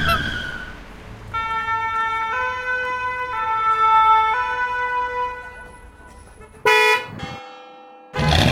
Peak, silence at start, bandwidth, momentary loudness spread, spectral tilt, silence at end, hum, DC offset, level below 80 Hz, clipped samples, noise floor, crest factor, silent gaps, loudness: -2 dBFS; 0 s; 16 kHz; 21 LU; -4 dB/octave; 0 s; none; under 0.1%; -38 dBFS; under 0.1%; -43 dBFS; 18 dB; none; -19 LUFS